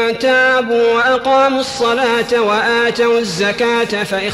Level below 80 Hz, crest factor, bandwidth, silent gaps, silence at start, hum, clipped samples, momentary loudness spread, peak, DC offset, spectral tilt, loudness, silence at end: -50 dBFS; 8 dB; 13 kHz; none; 0 s; none; under 0.1%; 4 LU; -4 dBFS; under 0.1%; -3.5 dB/octave; -13 LUFS; 0 s